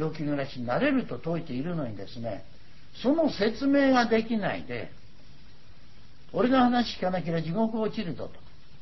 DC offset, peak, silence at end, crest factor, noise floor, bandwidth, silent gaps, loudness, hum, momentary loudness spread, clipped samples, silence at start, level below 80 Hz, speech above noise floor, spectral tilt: 1%; -12 dBFS; 0.35 s; 16 dB; -54 dBFS; 6 kHz; none; -28 LUFS; none; 15 LU; under 0.1%; 0 s; -56 dBFS; 27 dB; -7 dB/octave